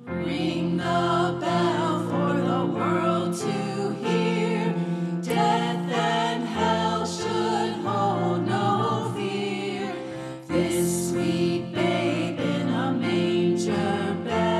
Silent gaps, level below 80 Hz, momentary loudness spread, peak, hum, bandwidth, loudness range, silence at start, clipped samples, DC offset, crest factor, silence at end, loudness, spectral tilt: none; -60 dBFS; 5 LU; -10 dBFS; none; 13.5 kHz; 2 LU; 0 s; under 0.1%; under 0.1%; 14 dB; 0 s; -25 LUFS; -5.5 dB/octave